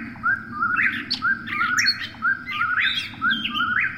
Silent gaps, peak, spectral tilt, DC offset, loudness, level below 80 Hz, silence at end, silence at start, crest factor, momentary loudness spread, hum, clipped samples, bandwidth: none; -8 dBFS; -1 dB/octave; under 0.1%; -22 LUFS; -56 dBFS; 0 s; 0 s; 16 dB; 4 LU; none; under 0.1%; 16.5 kHz